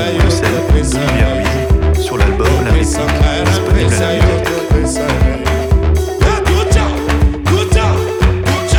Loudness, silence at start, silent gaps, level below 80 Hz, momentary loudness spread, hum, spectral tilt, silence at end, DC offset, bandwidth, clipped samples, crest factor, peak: -13 LUFS; 0 s; none; -16 dBFS; 2 LU; none; -5.5 dB/octave; 0 s; under 0.1%; 17.5 kHz; under 0.1%; 10 dB; -2 dBFS